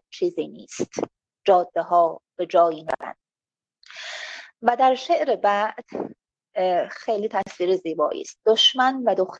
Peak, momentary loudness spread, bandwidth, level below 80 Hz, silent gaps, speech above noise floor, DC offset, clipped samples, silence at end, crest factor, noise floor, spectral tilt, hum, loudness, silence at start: -4 dBFS; 15 LU; 8.4 kHz; -72 dBFS; none; over 68 dB; under 0.1%; under 0.1%; 0 s; 18 dB; under -90 dBFS; -3 dB/octave; none; -22 LUFS; 0.15 s